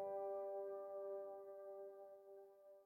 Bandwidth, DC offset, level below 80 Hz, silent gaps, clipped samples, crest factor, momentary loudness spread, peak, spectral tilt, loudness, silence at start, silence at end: 16.5 kHz; under 0.1%; under -90 dBFS; none; under 0.1%; 12 dB; 15 LU; -38 dBFS; -7 dB/octave; -51 LUFS; 0 s; 0 s